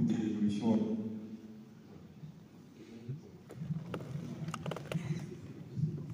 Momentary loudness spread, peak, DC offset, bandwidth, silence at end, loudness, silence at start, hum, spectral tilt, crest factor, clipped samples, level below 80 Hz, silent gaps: 21 LU; -18 dBFS; under 0.1%; 15.5 kHz; 0 s; -38 LUFS; 0 s; none; -7.5 dB/octave; 20 dB; under 0.1%; -72 dBFS; none